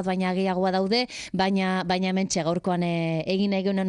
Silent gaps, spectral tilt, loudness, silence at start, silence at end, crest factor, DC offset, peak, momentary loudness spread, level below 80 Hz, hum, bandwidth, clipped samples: none; -5.5 dB/octave; -25 LUFS; 0 s; 0 s; 14 dB; under 0.1%; -10 dBFS; 2 LU; -58 dBFS; none; 10.5 kHz; under 0.1%